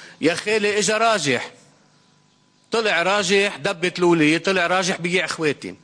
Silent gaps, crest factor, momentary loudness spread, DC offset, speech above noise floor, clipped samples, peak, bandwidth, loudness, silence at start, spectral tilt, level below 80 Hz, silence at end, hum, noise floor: none; 14 dB; 6 LU; under 0.1%; 39 dB; under 0.1%; -6 dBFS; 10.5 kHz; -19 LUFS; 0 s; -3.5 dB/octave; -64 dBFS; 0.1 s; none; -59 dBFS